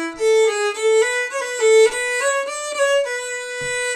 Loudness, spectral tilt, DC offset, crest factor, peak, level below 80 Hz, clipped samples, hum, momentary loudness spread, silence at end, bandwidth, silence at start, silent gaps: -18 LUFS; -0.5 dB/octave; under 0.1%; 12 dB; -6 dBFS; -60 dBFS; under 0.1%; none; 10 LU; 0 s; 14.5 kHz; 0 s; none